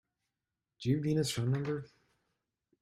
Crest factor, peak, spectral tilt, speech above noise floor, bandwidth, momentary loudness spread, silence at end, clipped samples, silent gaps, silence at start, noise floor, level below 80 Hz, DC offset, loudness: 18 dB; -18 dBFS; -6 dB/octave; 57 dB; 15.5 kHz; 8 LU; 0.95 s; under 0.1%; none; 0.8 s; -90 dBFS; -68 dBFS; under 0.1%; -34 LUFS